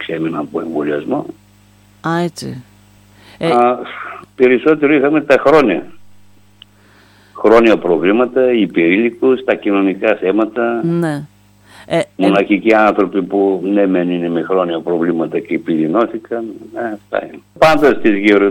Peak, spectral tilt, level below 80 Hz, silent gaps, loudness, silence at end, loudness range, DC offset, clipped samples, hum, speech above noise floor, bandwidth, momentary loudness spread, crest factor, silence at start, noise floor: 0 dBFS; -7 dB/octave; -50 dBFS; none; -14 LUFS; 0 s; 5 LU; under 0.1%; under 0.1%; 50 Hz at -50 dBFS; 34 dB; 16 kHz; 13 LU; 14 dB; 0 s; -47 dBFS